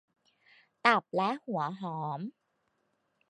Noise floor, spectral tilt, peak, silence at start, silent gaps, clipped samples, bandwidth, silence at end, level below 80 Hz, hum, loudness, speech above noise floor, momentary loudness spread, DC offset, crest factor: -77 dBFS; -6 dB/octave; -8 dBFS; 0.85 s; none; under 0.1%; 10 kHz; 1 s; -86 dBFS; none; -31 LUFS; 46 dB; 12 LU; under 0.1%; 26 dB